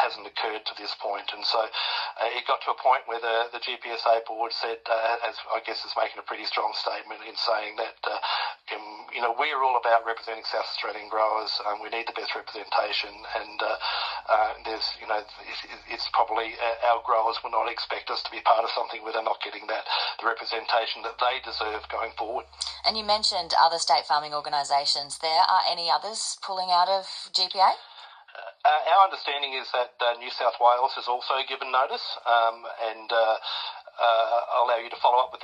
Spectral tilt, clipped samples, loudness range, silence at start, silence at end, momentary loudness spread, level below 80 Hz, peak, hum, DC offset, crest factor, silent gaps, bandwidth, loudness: -0.5 dB/octave; under 0.1%; 4 LU; 0 s; 0 s; 10 LU; -66 dBFS; -6 dBFS; none; under 0.1%; 20 dB; none; 10.5 kHz; -26 LUFS